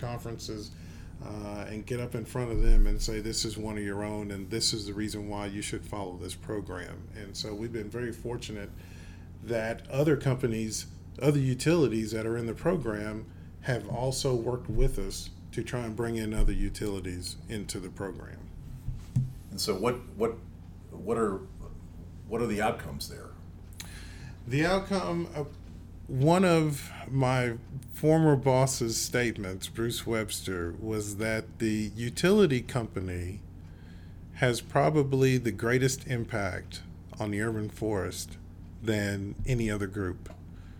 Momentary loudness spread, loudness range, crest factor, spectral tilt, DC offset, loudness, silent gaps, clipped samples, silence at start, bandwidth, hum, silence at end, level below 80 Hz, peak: 19 LU; 8 LU; 18 dB; -5.5 dB/octave; under 0.1%; -31 LUFS; none; under 0.1%; 0 s; 19 kHz; none; 0 s; -38 dBFS; -12 dBFS